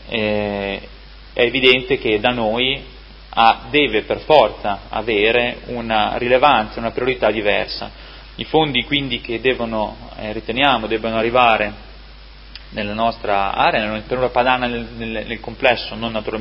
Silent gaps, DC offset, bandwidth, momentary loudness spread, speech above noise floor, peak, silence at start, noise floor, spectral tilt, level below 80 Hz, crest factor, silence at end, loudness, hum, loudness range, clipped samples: none; under 0.1%; 7.2 kHz; 13 LU; 21 dB; 0 dBFS; 0 s; -39 dBFS; -7 dB/octave; -38 dBFS; 18 dB; 0 s; -18 LUFS; none; 3 LU; under 0.1%